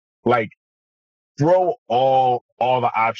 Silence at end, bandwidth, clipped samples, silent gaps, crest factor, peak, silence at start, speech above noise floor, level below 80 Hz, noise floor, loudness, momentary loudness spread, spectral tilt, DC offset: 0 s; 7 kHz; under 0.1%; 0.57-1.35 s, 1.78-1.86 s, 2.41-2.57 s; 14 dB; -6 dBFS; 0.25 s; over 72 dB; -62 dBFS; under -90 dBFS; -19 LUFS; 5 LU; -7 dB/octave; under 0.1%